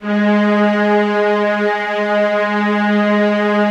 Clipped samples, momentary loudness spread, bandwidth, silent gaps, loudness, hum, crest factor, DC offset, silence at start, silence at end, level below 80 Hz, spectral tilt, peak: under 0.1%; 3 LU; 7.6 kHz; none; -15 LUFS; none; 10 dB; under 0.1%; 0 s; 0 s; -76 dBFS; -7 dB/octave; -4 dBFS